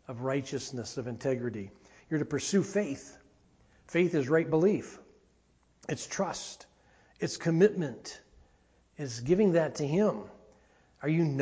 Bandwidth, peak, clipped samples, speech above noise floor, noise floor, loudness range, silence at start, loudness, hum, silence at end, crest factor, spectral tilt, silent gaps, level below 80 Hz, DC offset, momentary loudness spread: 8 kHz; -12 dBFS; under 0.1%; 38 dB; -67 dBFS; 4 LU; 0.1 s; -30 LUFS; none; 0 s; 20 dB; -6 dB/octave; none; -64 dBFS; under 0.1%; 18 LU